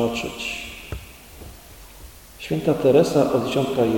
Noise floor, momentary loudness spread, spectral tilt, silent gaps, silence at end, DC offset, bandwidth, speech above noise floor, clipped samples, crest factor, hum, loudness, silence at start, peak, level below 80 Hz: -43 dBFS; 26 LU; -6 dB/octave; none; 0 s; under 0.1%; 17.5 kHz; 23 dB; under 0.1%; 18 dB; none; -21 LUFS; 0 s; -4 dBFS; -44 dBFS